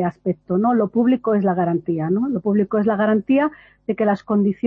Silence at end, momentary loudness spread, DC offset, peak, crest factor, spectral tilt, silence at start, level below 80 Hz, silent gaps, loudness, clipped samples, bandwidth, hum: 0 s; 5 LU; under 0.1%; -8 dBFS; 12 dB; -10.5 dB/octave; 0 s; -60 dBFS; none; -20 LUFS; under 0.1%; 4.8 kHz; none